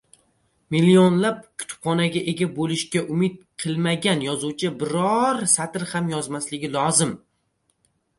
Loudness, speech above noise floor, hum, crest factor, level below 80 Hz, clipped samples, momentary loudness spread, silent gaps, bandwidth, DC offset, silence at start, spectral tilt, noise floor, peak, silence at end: -22 LUFS; 48 dB; none; 20 dB; -62 dBFS; under 0.1%; 11 LU; none; 11.5 kHz; under 0.1%; 0.7 s; -4.5 dB/octave; -70 dBFS; -4 dBFS; 1 s